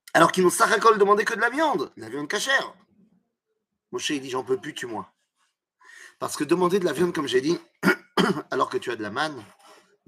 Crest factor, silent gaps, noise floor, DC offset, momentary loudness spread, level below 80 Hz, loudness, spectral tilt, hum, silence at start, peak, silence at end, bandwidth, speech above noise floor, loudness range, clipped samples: 22 dB; none; -79 dBFS; under 0.1%; 15 LU; -72 dBFS; -23 LUFS; -4 dB/octave; none; 0.15 s; -2 dBFS; 0.65 s; 15.5 kHz; 56 dB; 10 LU; under 0.1%